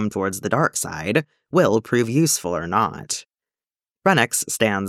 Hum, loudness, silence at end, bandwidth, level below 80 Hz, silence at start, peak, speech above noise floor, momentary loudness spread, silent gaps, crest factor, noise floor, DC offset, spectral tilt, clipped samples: none; -21 LUFS; 0 s; 17 kHz; -58 dBFS; 0 s; -2 dBFS; over 69 dB; 7 LU; none; 20 dB; under -90 dBFS; under 0.1%; -4 dB/octave; under 0.1%